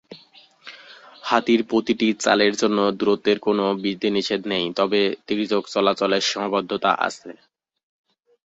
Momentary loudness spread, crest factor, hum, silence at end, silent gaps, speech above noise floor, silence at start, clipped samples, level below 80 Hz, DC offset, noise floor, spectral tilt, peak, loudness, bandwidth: 6 LU; 20 dB; none; 1.15 s; none; 31 dB; 0.1 s; under 0.1%; -64 dBFS; under 0.1%; -52 dBFS; -4 dB/octave; -2 dBFS; -21 LUFS; 8 kHz